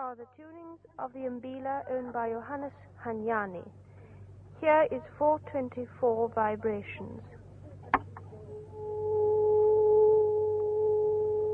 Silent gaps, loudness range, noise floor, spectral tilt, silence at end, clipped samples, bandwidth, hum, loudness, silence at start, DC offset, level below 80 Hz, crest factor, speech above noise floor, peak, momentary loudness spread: none; 9 LU; -50 dBFS; -9 dB/octave; 0 s; under 0.1%; 3.5 kHz; none; -29 LUFS; 0 s; under 0.1%; -62 dBFS; 20 dB; 18 dB; -10 dBFS; 23 LU